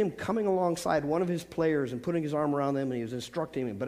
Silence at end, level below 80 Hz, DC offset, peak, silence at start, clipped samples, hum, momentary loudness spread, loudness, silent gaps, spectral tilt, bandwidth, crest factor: 0 s; -62 dBFS; under 0.1%; -12 dBFS; 0 s; under 0.1%; none; 6 LU; -30 LUFS; none; -6.5 dB/octave; 15.5 kHz; 18 dB